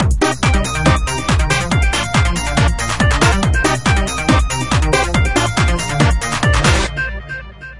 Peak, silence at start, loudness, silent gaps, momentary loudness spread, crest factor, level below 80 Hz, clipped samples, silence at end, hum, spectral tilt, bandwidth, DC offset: 0 dBFS; 0 s; -15 LUFS; none; 3 LU; 14 dB; -20 dBFS; under 0.1%; 0 s; none; -4.5 dB/octave; 11.5 kHz; 1%